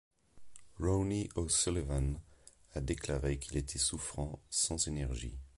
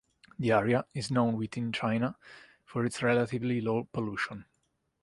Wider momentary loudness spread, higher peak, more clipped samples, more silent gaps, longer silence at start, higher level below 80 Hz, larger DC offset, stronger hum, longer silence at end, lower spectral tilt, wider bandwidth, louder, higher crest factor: about the same, 10 LU vs 8 LU; second, -18 dBFS vs -12 dBFS; neither; neither; about the same, 0.35 s vs 0.4 s; first, -44 dBFS vs -64 dBFS; neither; neither; second, 0.1 s vs 0.6 s; second, -4 dB/octave vs -6.5 dB/octave; about the same, 11.5 kHz vs 11.5 kHz; second, -35 LUFS vs -31 LUFS; about the same, 18 dB vs 20 dB